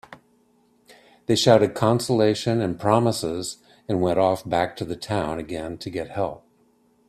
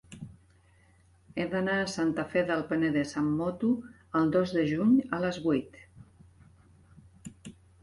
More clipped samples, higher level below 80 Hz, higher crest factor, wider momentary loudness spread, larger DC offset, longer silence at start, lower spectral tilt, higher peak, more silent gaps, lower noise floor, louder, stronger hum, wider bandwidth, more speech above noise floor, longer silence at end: neither; first, -54 dBFS vs -60 dBFS; first, 22 dB vs 16 dB; second, 14 LU vs 22 LU; neither; about the same, 0.1 s vs 0.1 s; about the same, -5.5 dB/octave vs -6.5 dB/octave; first, -2 dBFS vs -14 dBFS; neither; about the same, -62 dBFS vs -62 dBFS; first, -23 LUFS vs -29 LUFS; neither; first, 14.5 kHz vs 11.5 kHz; first, 40 dB vs 34 dB; first, 0.7 s vs 0.3 s